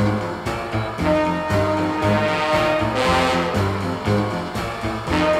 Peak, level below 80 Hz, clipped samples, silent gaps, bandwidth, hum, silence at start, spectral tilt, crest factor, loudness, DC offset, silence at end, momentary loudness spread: -4 dBFS; -38 dBFS; under 0.1%; none; 15.5 kHz; none; 0 s; -6 dB/octave; 16 dB; -21 LUFS; under 0.1%; 0 s; 7 LU